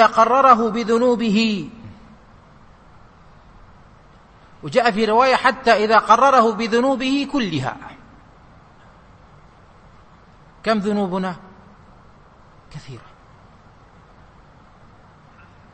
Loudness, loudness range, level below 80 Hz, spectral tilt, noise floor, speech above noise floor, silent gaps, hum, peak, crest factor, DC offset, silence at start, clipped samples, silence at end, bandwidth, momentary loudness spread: -17 LUFS; 14 LU; -52 dBFS; -5 dB/octave; -48 dBFS; 31 dB; none; none; 0 dBFS; 20 dB; under 0.1%; 0 s; under 0.1%; 2.75 s; 8.8 kHz; 24 LU